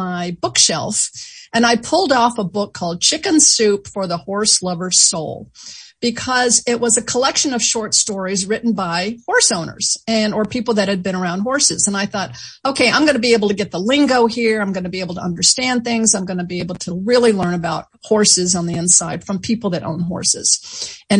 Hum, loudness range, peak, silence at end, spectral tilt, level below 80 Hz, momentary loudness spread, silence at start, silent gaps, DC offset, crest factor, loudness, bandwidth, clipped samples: none; 2 LU; 0 dBFS; 0 s; -2.5 dB/octave; -54 dBFS; 11 LU; 0 s; none; under 0.1%; 18 dB; -16 LUFS; 10.5 kHz; under 0.1%